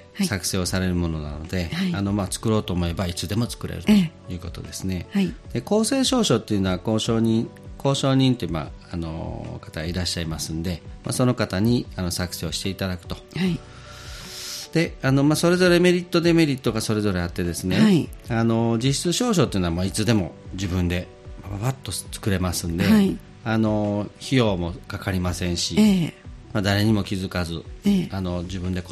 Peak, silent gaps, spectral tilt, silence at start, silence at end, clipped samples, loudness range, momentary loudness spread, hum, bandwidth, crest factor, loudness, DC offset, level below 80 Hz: -4 dBFS; none; -5.5 dB/octave; 0 s; 0 s; under 0.1%; 5 LU; 13 LU; none; 14.5 kHz; 18 dB; -23 LUFS; under 0.1%; -42 dBFS